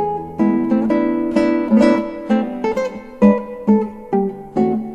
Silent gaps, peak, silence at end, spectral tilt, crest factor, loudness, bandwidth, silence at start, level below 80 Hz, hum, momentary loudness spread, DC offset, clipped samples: none; -2 dBFS; 0 s; -8 dB/octave; 16 dB; -17 LUFS; 8.4 kHz; 0 s; -48 dBFS; none; 7 LU; under 0.1%; under 0.1%